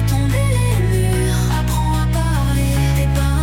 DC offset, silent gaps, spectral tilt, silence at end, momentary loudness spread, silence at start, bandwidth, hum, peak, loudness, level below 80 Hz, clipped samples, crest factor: under 0.1%; none; -6 dB/octave; 0 s; 1 LU; 0 s; 17 kHz; none; -4 dBFS; -17 LUFS; -20 dBFS; under 0.1%; 12 dB